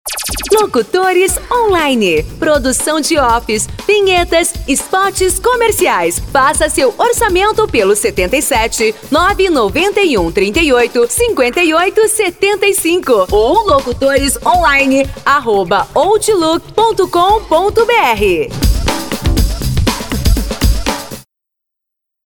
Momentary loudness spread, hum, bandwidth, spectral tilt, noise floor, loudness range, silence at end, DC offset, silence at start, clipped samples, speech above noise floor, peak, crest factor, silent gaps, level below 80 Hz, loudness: 5 LU; none; 19 kHz; -3.5 dB/octave; -78 dBFS; 2 LU; 1.05 s; 0.5%; 0.05 s; under 0.1%; 67 dB; 0 dBFS; 12 dB; none; -24 dBFS; -12 LUFS